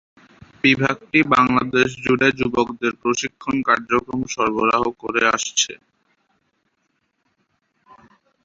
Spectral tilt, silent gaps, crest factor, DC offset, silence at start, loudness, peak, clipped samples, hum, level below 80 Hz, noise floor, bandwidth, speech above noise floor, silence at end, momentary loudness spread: -3.5 dB/octave; none; 20 dB; under 0.1%; 0.65 s; -19 LUFS; -2 dBFS; under 0.1%; none; -52 dBFS; -70 dBFS; 7.8 kHz; 51 dB; 2.7 s; 7 LU